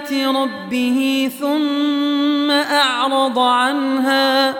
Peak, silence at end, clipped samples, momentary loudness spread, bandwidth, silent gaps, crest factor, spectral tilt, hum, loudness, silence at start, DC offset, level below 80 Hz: -4 dBFS; 0 s; under 0.1%; 5 LU; 18.5 kHz; none; 12 dB; -2.5 dB/octave; none; -16 LUFS; 0 s; under 0.1%; -70 dBFS